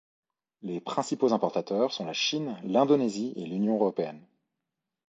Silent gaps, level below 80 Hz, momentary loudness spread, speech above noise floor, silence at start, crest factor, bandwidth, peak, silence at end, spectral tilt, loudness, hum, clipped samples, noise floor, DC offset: none; -78 dBFS; 11 LU; 58 dB; 0.65 s; 20 dB; 8.4 kHz; -8 dBFS; 0.9 s; -5 dB/octave; -28 LUFS; none; under 0.1%; -86 dBFS; under 0.1%